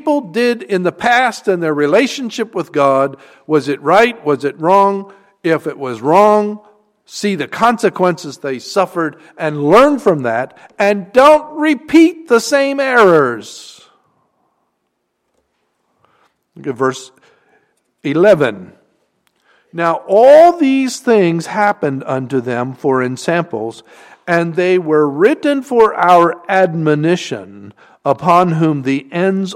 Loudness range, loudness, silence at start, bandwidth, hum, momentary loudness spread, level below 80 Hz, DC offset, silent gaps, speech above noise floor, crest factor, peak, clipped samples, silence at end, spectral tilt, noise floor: 6 LU; -13 LUFS; 0.05 s; 16 kHz; none; 13 LU; -56 dBFS; under 0.1%; none; 56 dB; 14 dB; 0 dBFS; under 0.1%; 0 s; -5.5 dB/octave; -69 dBFS